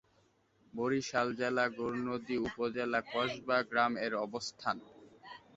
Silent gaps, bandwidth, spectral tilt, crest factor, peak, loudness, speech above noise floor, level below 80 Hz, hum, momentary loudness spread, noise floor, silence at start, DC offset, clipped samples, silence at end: none; 8 kHz; -3 dB/octave; 20 dB; -16 dBFS; -35 LUFS; 36 dB; -70 dBFS; none; 7 LU; -71 dBFS; 0.75 s; under 0.1%; under 0.1%; 0.2 s